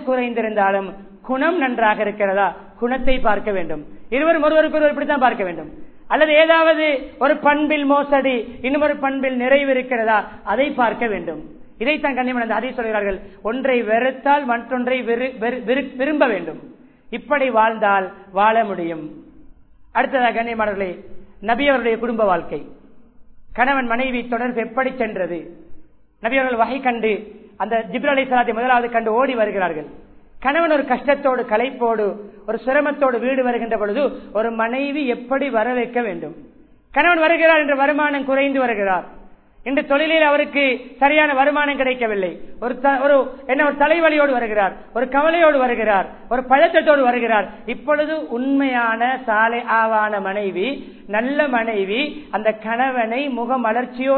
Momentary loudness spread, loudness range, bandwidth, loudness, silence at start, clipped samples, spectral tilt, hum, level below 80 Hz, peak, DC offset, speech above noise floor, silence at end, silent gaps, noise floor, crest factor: 11 LU; 5 LU; 4.5 kHz; -18 LUFS; 0 s; under 0.1%; -8.5 dB/octave; none; -42 dBFS; -2 dBFS; 0.2%; 26 dB; 0 s; none; -44 dBFS; 18 dB